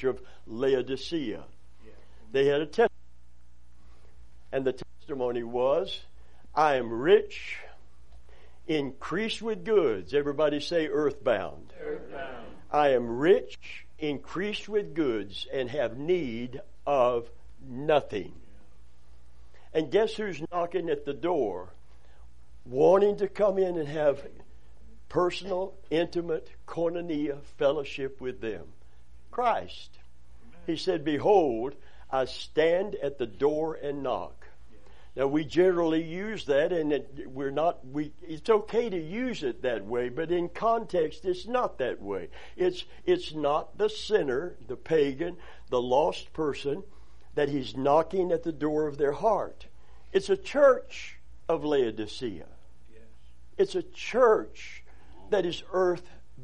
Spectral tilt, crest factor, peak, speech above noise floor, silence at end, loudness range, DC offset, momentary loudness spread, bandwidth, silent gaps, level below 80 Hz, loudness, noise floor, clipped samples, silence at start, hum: -6 dB/octave; 20 dB; -8 dBFS; 31 dB; 0 s; 4 LU; 0.9%; 15 LU; 10 kHz; none; -56 dBFS; -28 LUFS; -59 dBFS; under 0.1%; 0 s; 60 Hz at -60 dBFS